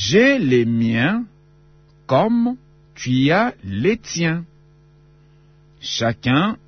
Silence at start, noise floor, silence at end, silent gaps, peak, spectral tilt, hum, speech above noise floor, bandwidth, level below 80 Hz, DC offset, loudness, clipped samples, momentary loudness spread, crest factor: 0 s; -51 dBFS; 0.15 s; none; -2 dBFS; -5.5 dB/octave; none; 33 dB; 6.6 kHz; -52 dBFS; under 0.1%; -19 LUFS; under 0.1%; 12 LU; 16 dB